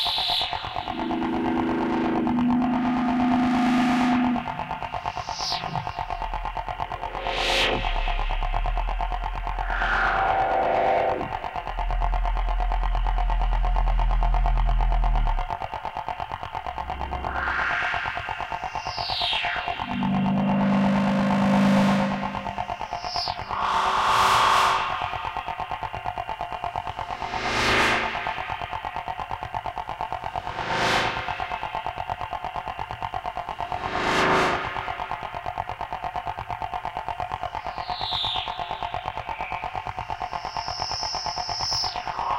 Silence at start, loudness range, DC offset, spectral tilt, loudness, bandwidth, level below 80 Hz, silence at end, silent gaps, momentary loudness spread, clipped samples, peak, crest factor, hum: 0 s; 7 LU; under 0.1%; -5 dB/octave; -26 LUFS; 13.5 kHz; -32 dBFS; 0 s; none; 11 LU; under 0.1%; -8 dBFS; 16 dB; none